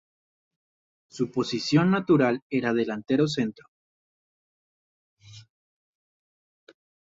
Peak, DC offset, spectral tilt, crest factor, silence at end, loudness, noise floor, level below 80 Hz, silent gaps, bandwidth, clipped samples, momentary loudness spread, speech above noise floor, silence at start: -8 dBFS; under 0.1%; -6.5 dB/octave; 20 dB; 1.7 s; -25 LUFS; under -90 dBFS; -68 dBFS; 2.42-2.50 s, 3.68-5.17 s; 7.8 kHz; under 0.1%; 9 LU; over 66 dB; 1.15 s